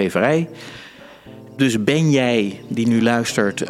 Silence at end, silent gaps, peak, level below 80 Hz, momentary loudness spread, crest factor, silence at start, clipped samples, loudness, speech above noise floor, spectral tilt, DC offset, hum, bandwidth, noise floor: 0 s; none; -2 dBFS; -58 dBFS; 19 LU; 18 dB; 0 s; under 0.1%; -18 LUFS; 23 dB; -5.5 dB/octave; under 0.1%; none; 14.5 kHz; -41 dBFS